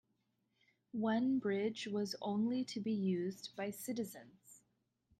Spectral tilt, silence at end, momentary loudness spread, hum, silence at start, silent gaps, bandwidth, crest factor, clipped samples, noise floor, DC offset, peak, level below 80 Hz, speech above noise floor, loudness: -5.5 dB/octave; 0.6 s; 9 LU; none; 0.95 s; none; 14 kHz; 14 dB; under 0.1%; -82 dBFS; under 0.1%; -26 dBFS; -82 dBFS; 44 dB; -39 LUFS